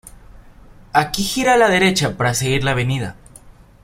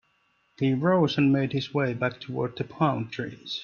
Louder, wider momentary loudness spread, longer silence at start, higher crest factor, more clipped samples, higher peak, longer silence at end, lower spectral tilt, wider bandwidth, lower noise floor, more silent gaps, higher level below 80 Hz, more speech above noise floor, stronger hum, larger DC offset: first, -17 LUFS vs -26 LUFS; about the same, 8 LU vs 10 LU; second, 0.05 s vs 0.6 s; about the same, 18 dB vs 18 dB; neither; first, -2 dBFS vs -8 dBFS; first, 0.35 s vs 0 s; second, -4 dB/octave vs -7.5 dB/octave; first, 16 kHz vs 7 kHz; second, -44 dBFS vs -69 dBFS; neither; first, -42 dBFS vs -64 dBFS; second, 27 dB vs 43 dB; neither; neither